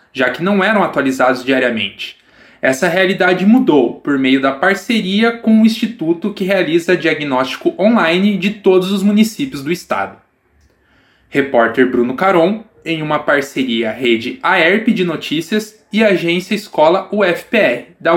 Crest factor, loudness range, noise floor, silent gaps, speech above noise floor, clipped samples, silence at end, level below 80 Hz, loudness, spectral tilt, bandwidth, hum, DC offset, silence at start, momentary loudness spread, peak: 14 dB; 3 LU; -55 dBFS; none; 41 dB; under 0.1%; 0 s; -58 dBFS; -14 LUFS; -5.5 dB/octave; 16.5 kHz; none; under 0.1%; 0.15 s; 8 LU; 0 dBFS